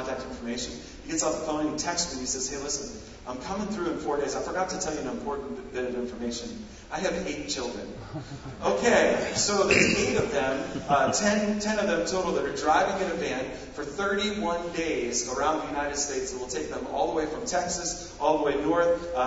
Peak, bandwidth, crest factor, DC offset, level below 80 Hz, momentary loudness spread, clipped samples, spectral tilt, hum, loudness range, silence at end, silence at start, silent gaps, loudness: -6 dBFS; 8 kHz; 22 dB; under 0.1%; -50 dBFS; 13 LU; under 0.1%; -3 dB/octave; none; 8 LU; 0 s; 0 s; none; -27 LUFS